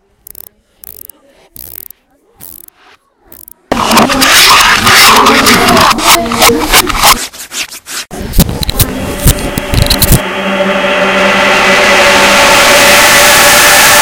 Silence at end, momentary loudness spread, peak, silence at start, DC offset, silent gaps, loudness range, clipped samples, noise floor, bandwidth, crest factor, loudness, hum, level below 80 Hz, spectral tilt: 0 s; 16 LU; 0 dBFS; 1.65 s; under 0.1%; none; 7 LU; 5%; -47 dBFS; over 20 kHz; 8 dB; -5 LUFS; none; -22 dBFS; -2 dB/octave